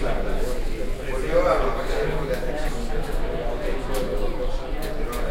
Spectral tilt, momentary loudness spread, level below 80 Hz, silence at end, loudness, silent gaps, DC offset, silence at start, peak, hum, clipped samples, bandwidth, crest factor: -5.5 dB/octave; 8 LU; -26 dBFS; 0 s; -27 LUFS; none; under 0.1%; 0 s; -8 dBFS; none; under 0.1%; 15.5 kHz; 16 dB